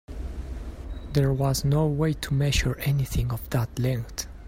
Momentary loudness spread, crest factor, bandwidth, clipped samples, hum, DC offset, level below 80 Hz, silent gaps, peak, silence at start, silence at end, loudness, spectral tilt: 15 LU; 16 dB; 16 kHz; under 0.1%; none; under 0.1%; -36 dBFS; none; -8 dBFS; 0.1 s; 0 s; -26 LUFS; -5.5 dB/octave